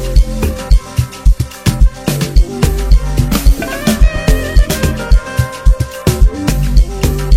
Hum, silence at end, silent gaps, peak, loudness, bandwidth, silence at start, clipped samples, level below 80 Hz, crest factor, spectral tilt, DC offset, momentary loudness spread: none; 0 s; none; 0 dBFS; -14 LUFS; 16 kHz; 0 s; 0.1%; -12 dBFS; 10 dB; -5.5 dB/octave; under 0.1%; 3 LU